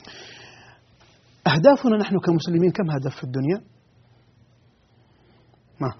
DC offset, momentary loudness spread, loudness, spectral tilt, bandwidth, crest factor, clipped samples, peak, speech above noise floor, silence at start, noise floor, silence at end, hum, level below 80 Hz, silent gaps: under 0.1%; 25 LU; -21 LUFS; -6 dB/octave; 6.4 kHz; 22 dB; under 0.1%; -2 dBFS; 38 dB; 0.05 s; -58 dBFS; 0.05 s; none; -62 dBFS; none